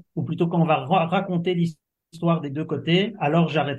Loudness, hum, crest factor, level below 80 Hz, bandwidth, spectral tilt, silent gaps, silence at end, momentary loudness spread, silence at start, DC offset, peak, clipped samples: -23 LUFS; none; 16 dB; -66 dBFS; 7.2 kHz; -8 dB/octave; none; 0 s; 7 LU; 0.15 s; under 0.1%; -6 dBFS; under 0.1%